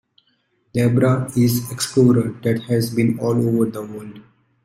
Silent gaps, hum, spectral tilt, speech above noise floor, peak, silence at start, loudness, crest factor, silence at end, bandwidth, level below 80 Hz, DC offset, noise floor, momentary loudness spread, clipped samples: none; none; -6.5 dB/octave; 47 dB; -2 dBFS; 0.75 s; -19 LUFS; 16 dB; 0.45 s; 16 kHz; -54 dBFS; under 0.1%; -65 dBFS; 13 LU; under 0.1%